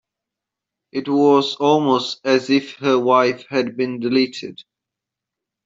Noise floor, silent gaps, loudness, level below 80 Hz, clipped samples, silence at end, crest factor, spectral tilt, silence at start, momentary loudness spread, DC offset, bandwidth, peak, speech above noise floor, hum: -85 dBFS; none; -18 LUFS; -68 dBFS; under 0.1%; 1.05 s; 16 dB; -5.5 dB/octave; 0.95 s; 9 LU; under 0.1%; 7.8 kHz; -2 dBFS; 67 dB; none